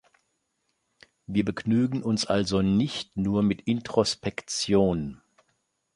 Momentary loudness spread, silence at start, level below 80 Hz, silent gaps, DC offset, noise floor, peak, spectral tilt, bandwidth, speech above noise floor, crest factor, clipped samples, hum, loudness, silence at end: 7 LU; 1.3 s; -52 dBFS; none; under 0.1%; -76 dBFS; -6 dBFS; -5.5 dB/octave; 11.5 kHz; 51 dB; 20 dB; under 0.1%; none; -26 LUFS; 0.8 s